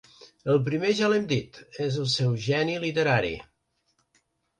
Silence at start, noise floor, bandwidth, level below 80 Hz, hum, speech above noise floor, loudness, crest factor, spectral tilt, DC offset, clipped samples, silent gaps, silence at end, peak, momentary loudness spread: 0.45 s; -73 dBFS; 10.5 kHz; -58 dBFS; none; 48 dB; -26 LUFS; 18 dB; -5.5 dB/octave; under 0.1%; under 0.1%; none; 1.2 s; -10 dBFS; 9 LU